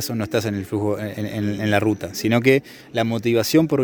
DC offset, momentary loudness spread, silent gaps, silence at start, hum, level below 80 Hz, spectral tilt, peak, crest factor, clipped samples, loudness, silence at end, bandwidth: under 0.1%; 8 LU; none; 0 s; none; -56 dBFS; -5.5 dB/octave; -2 dBFS; 18 dB; under 0.1%; -21 LUFS; 0 s; over 20 kHz